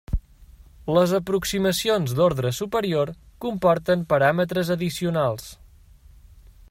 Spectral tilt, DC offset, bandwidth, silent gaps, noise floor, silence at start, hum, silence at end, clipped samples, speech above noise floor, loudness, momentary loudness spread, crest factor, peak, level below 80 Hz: -5.5 dB/octave; under 0.1%; 16 kHz; none; -50 dBFS; 0.1 s; none; 1.15 s; under 0.1%; 28 dB; -23 LUFS; 12 LU; 18 dB; -6 dBFS; -42 dBFS